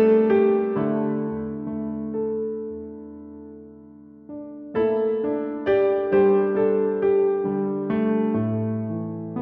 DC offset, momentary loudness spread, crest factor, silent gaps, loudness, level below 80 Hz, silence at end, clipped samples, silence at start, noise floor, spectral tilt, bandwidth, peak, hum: under 0.1%; 19 LU; 14 dB; none; -23 LUFS; -58 dBFS; 0 s; under 0.1%; 0 s; -46 dBFS; -11 dB/octave; 3.9 kHz; -8 dBFS; none